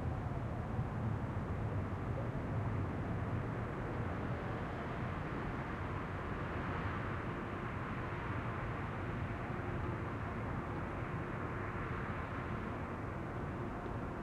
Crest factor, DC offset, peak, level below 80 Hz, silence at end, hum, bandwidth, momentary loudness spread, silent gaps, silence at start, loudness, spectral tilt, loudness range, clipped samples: 14 dB; under 0.1%; -26 dBFS; -50 dBFS; 0 s; none; 10.5 kHz; 2 LU; none; 0 s; -41 LUFS; -8.5 dB/octave; 2 LU; under 0.1%